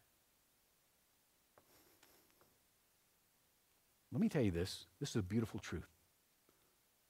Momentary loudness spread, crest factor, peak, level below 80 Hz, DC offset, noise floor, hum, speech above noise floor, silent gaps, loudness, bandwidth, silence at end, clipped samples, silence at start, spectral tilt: 12 LU; 20 dB; -26 dBFS; -68 dBFS; under 0.1%; -77 dBFS; none; 36 dB; none; -41 LUFS; 16 kHz; 1.25 s; under 0.1%; 4.1 s; -6 dB/octave